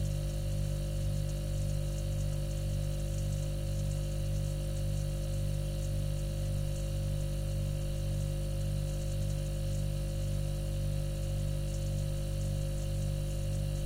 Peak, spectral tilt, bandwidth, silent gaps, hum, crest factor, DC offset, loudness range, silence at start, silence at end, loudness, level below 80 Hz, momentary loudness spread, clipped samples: -24 dBFS; -6.5 dB/octave; 16 kHz; none; 50 Hz at -35 dBFS; 10 dB; under 0.1%; 0 LU; 0 s; 0 s; -35 LUFS; -36 dBFS; 1 LU; under 0.1%